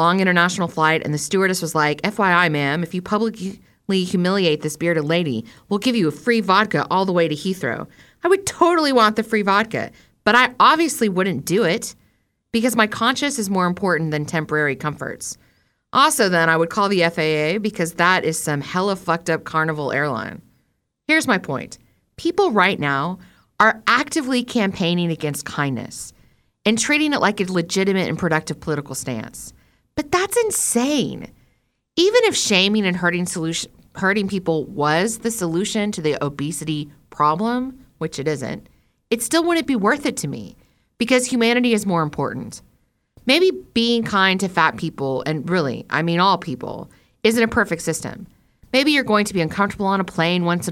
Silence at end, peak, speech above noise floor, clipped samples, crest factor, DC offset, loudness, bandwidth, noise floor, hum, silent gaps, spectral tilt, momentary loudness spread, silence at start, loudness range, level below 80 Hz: 0 s; -2 dBFS; 49 dB; under 0.1%; 18 dB; under 0.1%; -19 LUFS; 17 kHz; -68 dBFS; none; none; -4 dB/octave; 12 LU; 0 s; 4 LU; -54 dBFS